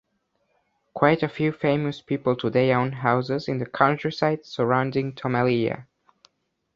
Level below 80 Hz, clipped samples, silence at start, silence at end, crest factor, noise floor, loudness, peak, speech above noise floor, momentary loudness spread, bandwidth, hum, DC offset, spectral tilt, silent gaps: -60 dBFS; under 0.1%; 0.95 s; 0.95 s; 22 dB; -72 dBFS; -24 LUFS; -2 dBFS; 49 dB; 6 LU; 7.4 kHz; none; under 0.1%; -8 dB/octave; none